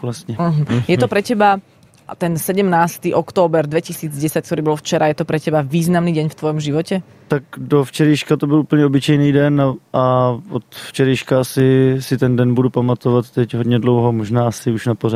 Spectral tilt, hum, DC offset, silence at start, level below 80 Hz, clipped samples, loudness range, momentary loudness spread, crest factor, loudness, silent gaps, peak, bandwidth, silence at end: -6.5 dB/octave; none; under 0.1%; 0 s; -52 dBFS; under 0.1%; 3 LU; 8 LU; 14 dB; -16 LUFS; none; -2 dBFS; 15.5 kHz; 0 s